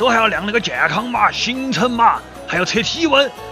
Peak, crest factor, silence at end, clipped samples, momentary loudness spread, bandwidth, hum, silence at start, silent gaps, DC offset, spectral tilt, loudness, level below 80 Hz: -2 dBFS; 16 dB; 0 s; under 0.1%; 5 LU; 16 kHz; none; 0 s; none; under 0.1%; -3.5 dB/octave; -16 LUFS; -44 dBFS